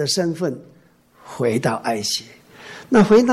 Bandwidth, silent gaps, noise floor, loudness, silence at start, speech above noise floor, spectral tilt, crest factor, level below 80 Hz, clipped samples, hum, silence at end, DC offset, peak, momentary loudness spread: 13.5 kHz; none; -53 dBFS; -19 LUFS; 0 s; 35 dB; -4.5 dB/octave; 14 dB; -52 dBFS; under 0.1%; none; 0 s; under 0.1%; -4 dBFS; 24 LU